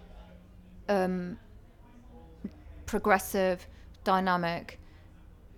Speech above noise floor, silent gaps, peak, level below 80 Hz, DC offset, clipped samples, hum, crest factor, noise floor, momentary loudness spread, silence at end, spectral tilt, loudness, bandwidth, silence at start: 25 dB; none; -10 dBFS; -52 dBFS; under 0.1%; under 0.1%; none; 24 dB; -53 dBFS; 21 LU; 0.05 s; -5.5 dB/octave; -30 LUFS; 18.5 kHz; 0 s